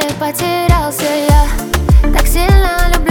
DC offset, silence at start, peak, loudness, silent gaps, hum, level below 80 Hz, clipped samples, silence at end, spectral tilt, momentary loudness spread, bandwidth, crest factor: under 0.1%; 0 s; 0 dBFS; -13 LUFS; none; none; -12 dBFS; under 0.1%; 0 s; -5 dB/octave; 5 LU; 20 kHz; 10 dB